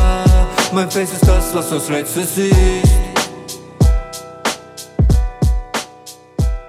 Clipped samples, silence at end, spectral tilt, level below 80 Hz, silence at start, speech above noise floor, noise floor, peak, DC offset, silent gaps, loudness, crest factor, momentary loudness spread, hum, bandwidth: under 0.1%; 0 s; -5 dB/octave; -18 dBFS; 0 s; 25 dB; -39 dBFS; 0 dBFS; under 0.1%; none; -16 LUFS; 14 dB; 15 LU; none; 16 kHz